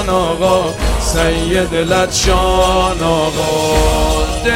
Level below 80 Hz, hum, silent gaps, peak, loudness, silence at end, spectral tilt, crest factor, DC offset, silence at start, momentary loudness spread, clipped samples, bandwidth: -20 dBFS; none; none; 0 dBFS; -14 LUFS; 0 s; -4 dB/octave; 12 dB; under 0.1%; 0 s; 3 LU; under 0.1%; 16.5 kHz